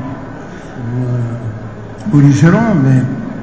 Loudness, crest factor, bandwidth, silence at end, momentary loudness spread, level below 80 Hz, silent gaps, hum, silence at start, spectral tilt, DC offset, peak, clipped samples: -12 LUFS; 14 dB; 8 kHz; 0 s; 19 LU; -40 dBFS; none; none; 0 s; -8 dB/octave; 1%; 0 dBFS; 0.2%